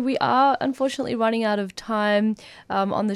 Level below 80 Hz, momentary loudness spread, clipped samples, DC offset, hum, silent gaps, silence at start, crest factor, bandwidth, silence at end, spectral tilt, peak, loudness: -62 dBFS; 8 LU; under 0.1%; under 0.1%; none; none; 0 s; 14 dB; 12 kHz; 0 s; -5.5 dB/octave; -8 dBFS; -23 LUFS